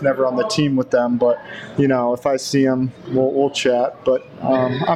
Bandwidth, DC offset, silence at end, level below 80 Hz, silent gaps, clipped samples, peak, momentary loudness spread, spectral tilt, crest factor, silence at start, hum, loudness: 13.5 kHz; under 0.1%; 0 s; -56 dBFS; none; under 0.1%; -6 dBFS; 4 LU; -5.5 dB/octave; 12 dB; 0 s; none; -19 LUFS